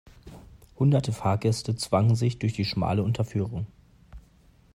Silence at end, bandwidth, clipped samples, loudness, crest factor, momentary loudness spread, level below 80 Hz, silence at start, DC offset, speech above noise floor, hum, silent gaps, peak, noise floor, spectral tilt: 0.55 s; 12.5 kHz; under 0.1%; -26 LUFS; 16 dB; 7 LU; -52 dBFS; 0.25 s; under 0.1%; 33 dB; none; none; -10 dBFS; -58 dBFS; -6.5 dB/octave